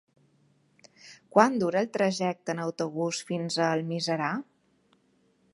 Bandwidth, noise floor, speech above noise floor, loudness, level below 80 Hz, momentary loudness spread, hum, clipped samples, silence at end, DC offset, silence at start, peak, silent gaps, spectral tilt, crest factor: 11.5 kHz; -67 dBFS; 40 dB; -28 LUFS; -78 dBFS; 9 LU; none; under 0.1%; 1.1 s; under 0.1%; 1.05 s; -4 dBFS; none; -5 dB/octave; 26 dB